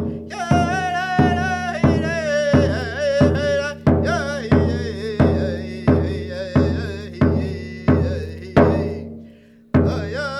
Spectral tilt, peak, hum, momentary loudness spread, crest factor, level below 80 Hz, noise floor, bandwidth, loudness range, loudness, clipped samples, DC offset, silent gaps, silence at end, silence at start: -7 dB/octave; 0 dBFS; none; 9 LU; 18 dB; -34 dBFS; -46 dBFS; 11.5 kHz; 2 LU; -20 LUFS; under 0.1%; under 0.1%; none; 0 s; 0 s